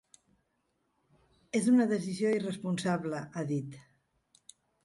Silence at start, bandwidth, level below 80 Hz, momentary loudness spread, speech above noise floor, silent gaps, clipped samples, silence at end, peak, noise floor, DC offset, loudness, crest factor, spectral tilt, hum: 1.55 s; 11.5 kHz; -74 dBFS; 11 LU; 48 dB; none; under 0.1%; 1.05 s; -16 dBFS; -78 dBFS; under 0.1%; -31 LUFS; 18 dB; -6 dB/octave; none